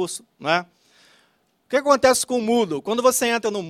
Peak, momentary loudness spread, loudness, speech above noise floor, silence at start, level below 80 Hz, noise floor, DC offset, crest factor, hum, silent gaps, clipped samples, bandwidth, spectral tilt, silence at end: -2 dBFS; 8 LU; -20 LUFS; 44 dB; 0 s; -60 dBFS; -64 dBFS; under 0.1%; 20 dB; none; none; under 0.1%; 16 kHz; -3 dB/octave; 0 s